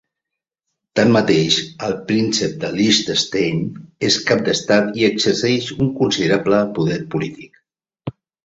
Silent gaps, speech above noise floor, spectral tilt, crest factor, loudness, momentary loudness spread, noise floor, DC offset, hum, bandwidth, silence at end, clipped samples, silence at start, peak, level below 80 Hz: none; 66 dB; -4.5 dB/octave; 18 dB; -17 LUFS; 10 LU; -83 dBFS; under 0.1%; none; 8 kHz; 0.35 s; under 0.1%; 0.95 s; -2 dBFS; -52 dBFS